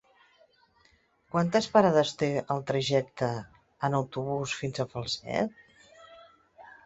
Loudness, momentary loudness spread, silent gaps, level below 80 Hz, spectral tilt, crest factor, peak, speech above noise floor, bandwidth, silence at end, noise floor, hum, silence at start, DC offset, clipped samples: -29 LUFS; 10 LU; none; -64 dBFS; -5.5 dB/octave; 22 dB; -8 dBFS; 38 dB; 8.2 kHz; 0.15 s; -66 dBFS; none; 1.35 s; under 0.1%; under 0.1%